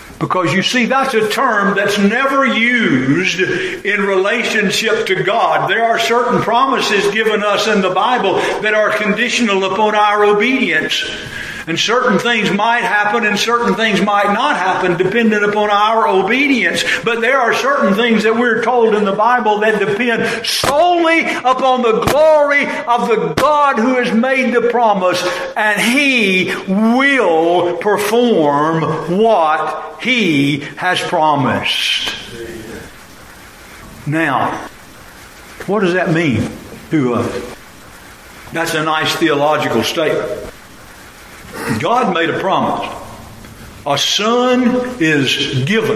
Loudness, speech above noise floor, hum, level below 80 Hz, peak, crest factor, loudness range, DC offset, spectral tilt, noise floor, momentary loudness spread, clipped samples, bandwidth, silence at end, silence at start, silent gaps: -13 LUFS; 23 dB; none; -48 dBFS; -2 dBFS; 14 dB; 6 LU; under 0.1%; -4.5 dB/octave; -37 dBFS; 8 LU; under 0.1%; 15.5 kHz; 0 s; 0 s; none